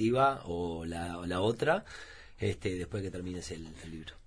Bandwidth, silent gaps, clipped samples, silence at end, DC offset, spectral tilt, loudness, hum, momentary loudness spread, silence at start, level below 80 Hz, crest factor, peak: 10.5 kHz; none; under 0.1%; 0.1 s; under 0.1%; -6 dB/octave; -34 LUFS; none; 16 LU; 0 s; -54 dBFS; 18 dB; -16 dBFS